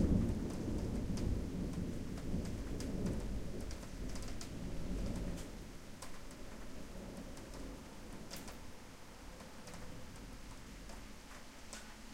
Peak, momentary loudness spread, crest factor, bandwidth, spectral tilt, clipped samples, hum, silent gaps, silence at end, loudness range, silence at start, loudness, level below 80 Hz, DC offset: -22 dBFS; 13 LU; 20 dB; 16.5 kHz; -6 dB/octave; under 0.1%; none; none; 0 s; 10 LU; 0 s; -45 LUFS; -46 dBFS; under 0.1%